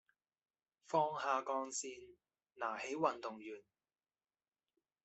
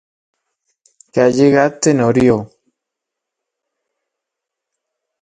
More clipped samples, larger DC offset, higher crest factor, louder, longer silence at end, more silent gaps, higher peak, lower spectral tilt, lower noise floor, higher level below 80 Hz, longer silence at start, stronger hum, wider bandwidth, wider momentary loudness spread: neither; neither; first, 24 dB vs 18 dB; second, -40 LUFS vs -13 LUFS; second, 1.45 s vs 2.75 s; neither; second, -20 dBFS vs 0 dBFS; second, -3 dB/octave vs -6 dB/octave; first, under -90 dBFS vs -81 dBFS; second, -88 dBFS vs -50 dBFS; second, 0.9 s vs 1.15 s; neither; second, 8.2 kHz vs 9.6 kHz; first, 15 LU vs 6 LU